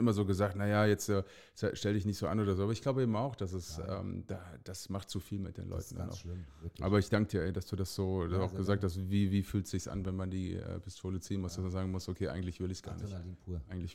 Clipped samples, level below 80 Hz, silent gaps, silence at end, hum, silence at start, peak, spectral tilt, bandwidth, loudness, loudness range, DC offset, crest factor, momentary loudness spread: under 0.1%; -54 dBFS; none; 0 s; none; 0 s; -16 dBFS; -6.5 dB/octave; 15.5 kHz; -36 LUFS; 6 LU; under 0.1%; 18 dB; 12 LU